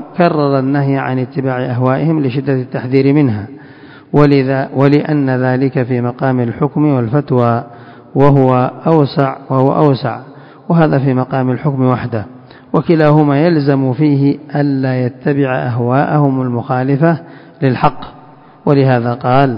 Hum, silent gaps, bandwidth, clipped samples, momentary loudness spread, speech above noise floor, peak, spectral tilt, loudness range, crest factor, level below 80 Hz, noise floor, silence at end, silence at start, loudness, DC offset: none; none; 5.4 kHz; 0.3%; 7 LU; 24 dB; 0 dBFS; -10.5 dB/octave; 2 LU; 12 dB; -48 dBFS; -37 dBFS; 0 s; 0 s; -13 LUFS; under 0.1%